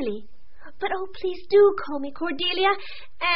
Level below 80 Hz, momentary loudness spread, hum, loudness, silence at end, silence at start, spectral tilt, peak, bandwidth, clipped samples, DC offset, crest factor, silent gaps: -54 dBFS; 14 LU; none; -24 LUFS; 0 s; 0 s; -0.5 dB/octave; -8 dBFS; 5.8 kHz; under 0.1%; 3%; 16 dB; none